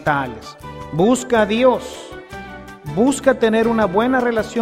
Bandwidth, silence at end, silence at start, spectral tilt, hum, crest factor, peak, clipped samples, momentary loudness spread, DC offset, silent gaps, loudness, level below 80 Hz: 15 kHz; 0 s; 0 s; -5 dB/octave; none; 16 dB; 0 dBFS; under 0.1%; 18 LU; under 0.1%; none; -17 LUFS; -44 dBFS